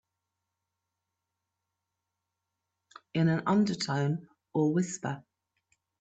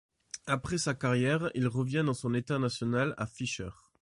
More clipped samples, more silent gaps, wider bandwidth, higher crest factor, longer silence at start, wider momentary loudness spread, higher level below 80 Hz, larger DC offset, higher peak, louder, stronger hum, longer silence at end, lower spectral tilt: neither; neither; second, 8.6 kHz vs 11.5 kHz; about the same, 18 dB vs 16 dB; first, 3.15 s vs 0.35 s; first, 11 LU vs 8 LU; second, -72 dBFS vs -58 dBFS; neither; about the same, -16 dBFS vs -16 dBFS; about the same, -30 LUFS vs -31 LUFS; neither; first, 0.8 s vs 0.3 s; about the same, -6 dB/octave vs -5.5 dB/octave